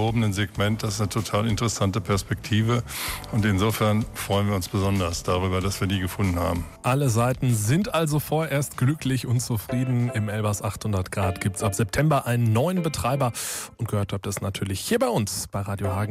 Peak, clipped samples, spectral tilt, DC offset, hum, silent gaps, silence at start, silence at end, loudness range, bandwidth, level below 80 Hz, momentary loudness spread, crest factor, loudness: -12 dBFS; under 0.1%; -5.5 dB/octave; under 0.1%; none; none; 0 s; 0 s; 2 LU; 16 kHz; -44 dBFS; 6 LU; 12 dB; -25 LUFS